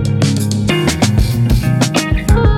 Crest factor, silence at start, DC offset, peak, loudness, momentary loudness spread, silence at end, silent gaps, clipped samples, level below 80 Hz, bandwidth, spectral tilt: 12 dB; 0 s; under 0.1%; 0 dBFS; -14 LUFS; 2 LU; 0 s; none; under 0.1%; -20 dBFS; 16.5 kHz; -5.5 dB/octave